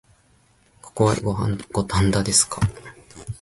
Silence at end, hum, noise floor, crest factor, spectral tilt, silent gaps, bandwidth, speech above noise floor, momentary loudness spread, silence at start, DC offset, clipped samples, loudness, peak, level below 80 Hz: 0.05 s; none; -59 dBFS; 20 dB; -4.5 dB/octave; none; 12 kHz; 38 dB; 22 LU; 0.85 s; under 0.1%; under 0.1%; -21 LUFS; -4 dBFS; -40 dBFS